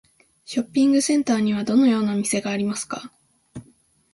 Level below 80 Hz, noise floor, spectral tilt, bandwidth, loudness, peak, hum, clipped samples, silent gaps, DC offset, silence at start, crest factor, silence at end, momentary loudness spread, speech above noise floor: -62 dBFS; -58 dBFS; -4.5 dB/octave; 11.5 kHz; -21 LUFS; -8 dBFS; none; under 0.1%; none; under 0.1%; 0.5 s; 14 dB; 0.5 s; 16 LU; 38 dB